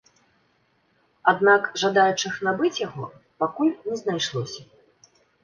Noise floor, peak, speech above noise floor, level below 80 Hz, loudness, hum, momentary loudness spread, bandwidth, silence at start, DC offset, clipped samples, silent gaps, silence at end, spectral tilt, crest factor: -66 dBFS; -2 dBFS; 43 dB; -68 dBFS; -23 LUFS; none; 15 LU; 7.2 kHz; 1.25 s; under 0.1%; under 0.1%; none; 0.8 s; -4 dB/octave; 22 dB